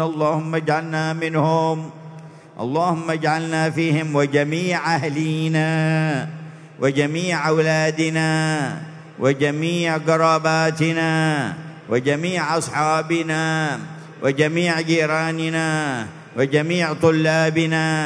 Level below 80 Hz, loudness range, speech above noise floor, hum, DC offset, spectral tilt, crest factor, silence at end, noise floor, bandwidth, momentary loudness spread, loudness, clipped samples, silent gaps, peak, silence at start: -66 dBFS; 2 LU; 20 dB; none; under 0.1%; -5.5 dB/octave; 18 dB; 0 s; -40 dBFS; 11 kHz; 9 LU; -20 LUFS; under 0.1%; none; -2 dBFS; 0 s